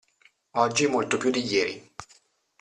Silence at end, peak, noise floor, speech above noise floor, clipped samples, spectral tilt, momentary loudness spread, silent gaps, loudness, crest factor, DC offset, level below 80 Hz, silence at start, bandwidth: 0.55 s; -8 dBFS; -63 dBFS; 38 dB; under 0.1%; -3.5 dB/octave; 19 LU; none; -25 LUFS; 20 dB; under 0.1%; -66 dBFS; 0.55 s; 11 kHz